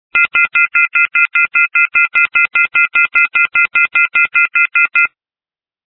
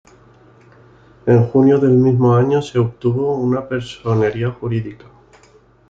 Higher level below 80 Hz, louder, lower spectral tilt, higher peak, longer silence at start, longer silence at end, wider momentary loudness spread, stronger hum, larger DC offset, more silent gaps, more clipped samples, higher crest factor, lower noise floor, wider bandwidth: second, -60 dBFS vs -50 dBFS; first, -10 LUFS vs -16 LUFS; second, -2.5 dB/octave vs -9 dB/octave; about the same, 0 dBFS vs -2 dBFS; second, 0.15 s vs 1.25 s; about the same, 0.9 s vs 0.95 s; second, 1 LU vs 11 LU; neither; neither; neither; neither; about the same, 14 dB vs 16 dB; first, under -90 dBFS vs -50 dBFS; second, 5.2 kHz vs 7.6 kHz